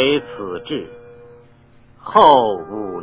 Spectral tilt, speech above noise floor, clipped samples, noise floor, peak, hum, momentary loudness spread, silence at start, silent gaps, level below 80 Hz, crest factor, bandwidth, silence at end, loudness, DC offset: -9 dB/octave; 32 dB; under 0.1%; -48 dBFS; 0 dBFS; none; 19 LU; 0 s; none; -52 dBFS; 18 dB; 4 kHz; 0 s; -16 LUFS; under 0.1%